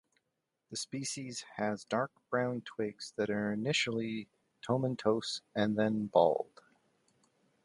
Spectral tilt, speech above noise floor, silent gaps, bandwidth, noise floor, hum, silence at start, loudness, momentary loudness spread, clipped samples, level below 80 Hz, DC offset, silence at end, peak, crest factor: -4.5 dB/octave; 51 dB; none; 11.5 kHz; -85 dBFS; none; 0.7 s; -34 LUFS; 12 LU; under 0.1%; -74 dBFS; under 0.1%; 1.2 s; -12 dBFS; 22 dB